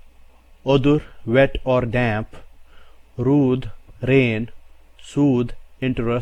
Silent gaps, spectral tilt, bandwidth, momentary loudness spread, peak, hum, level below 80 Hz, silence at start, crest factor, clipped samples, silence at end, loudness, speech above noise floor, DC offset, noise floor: none; -8 dB/octave; 9.4 kHz; 12 LU; -4 dBFS; none; -38 dBFS; 0.65 s; 16 dB; under 0.1%; 0 s; -20 LUFS; 28 dB; under 0.1%; -47 dBFS